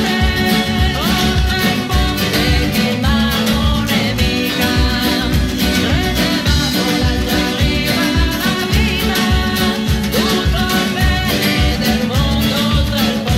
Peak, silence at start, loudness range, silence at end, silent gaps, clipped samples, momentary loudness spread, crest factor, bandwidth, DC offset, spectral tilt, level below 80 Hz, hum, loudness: -4 dBFS; 0 s; 0 LU; 0 s; none; under 0.1%; 1 LU; 10 dB; 16.5 kHz; under 0.1%; -4.5 dB/octave; -22 dBFS; none; -15 LUFS